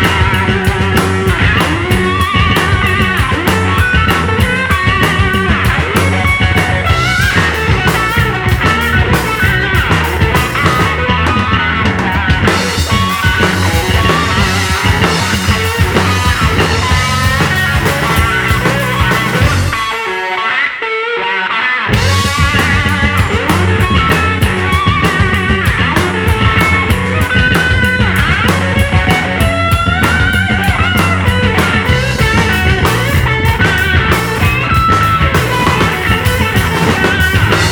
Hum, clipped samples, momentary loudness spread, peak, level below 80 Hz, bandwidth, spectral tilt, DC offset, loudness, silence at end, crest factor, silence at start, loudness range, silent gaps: none; under 0.1%; 2 LU; 0 dBFS; -22 dBFS; over 20 kHz; -5 dB/octave; under 0.1%; -11 LUFS; 0 s; 12 dB; 0 s; 1 LU; none